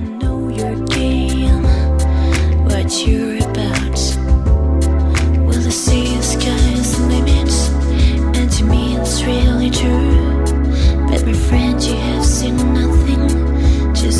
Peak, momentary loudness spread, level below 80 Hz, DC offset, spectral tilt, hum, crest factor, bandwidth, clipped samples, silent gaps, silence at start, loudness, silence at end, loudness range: -2 dBFS; 3 LU; -16 dBFS; under 0.1%; -5.5 dB/octave; none; 10 dB; 12.5 kHz; under 0.1%; none; 0 s; -15 LUFS; 0 s; 1 LU